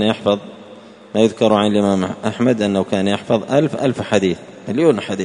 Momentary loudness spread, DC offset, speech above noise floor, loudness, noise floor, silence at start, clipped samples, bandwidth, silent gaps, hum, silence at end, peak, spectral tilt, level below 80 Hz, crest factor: 8 LU; under 0.1%; 23 dB; -17 LUFS; -40 dBFS; 0 s; under 0.1%; 10.5 kHz; none; none; 0 s; 0 dBFS; -6 dB/octave; -56 dBFS; 16 dB